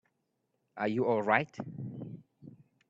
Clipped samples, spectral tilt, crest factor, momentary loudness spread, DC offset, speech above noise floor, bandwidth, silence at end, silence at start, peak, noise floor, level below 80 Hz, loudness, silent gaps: under 0.1%; -7.5 dB/octave; 24 dB; 20 LU; under 0.1%; 49 dB; 7.8 kHz; 0.35 s; 0.75 s; -10 dBFS; -80 dBFS; -74 dBFS; -32 LUFS; none